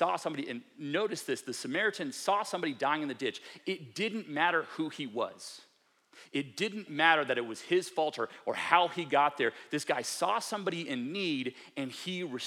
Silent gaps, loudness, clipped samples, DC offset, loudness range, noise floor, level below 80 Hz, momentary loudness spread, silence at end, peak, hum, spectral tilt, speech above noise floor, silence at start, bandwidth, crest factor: none; -32 LUFS; under 0.1%; under 0.1%; 5 LU; -66 dBFS; under -90 dBFS; 11 LU; 0 s; -8 dBFS; none; -3.5 dB/octave; 33 dB; 0 s; 17 kHz; 26 dB